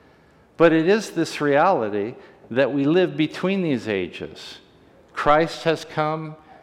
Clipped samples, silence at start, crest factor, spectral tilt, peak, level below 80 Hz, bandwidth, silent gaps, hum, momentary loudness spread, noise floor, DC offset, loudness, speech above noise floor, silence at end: under 0.1%; 0.6 s; 16 dB; -6 dB/octave; -6 dBFS; -54 dBFS; 13.5 kHz; none; none; 15 LU; -54 dBFS; under 0.1%; -21 LUFS; 33 dB; 0.3 s